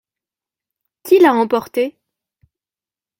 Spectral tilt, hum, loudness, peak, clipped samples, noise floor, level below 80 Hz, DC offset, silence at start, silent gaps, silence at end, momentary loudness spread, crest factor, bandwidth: -5 dB/octave; none; -15 LUFS; -2 dBFS; under 0.1%; under -90 dBFS; -64 dBFS; under 0.1%; 1.05 s; none; 1.3 s; 12 LU; 18 dB; 16.5 kHz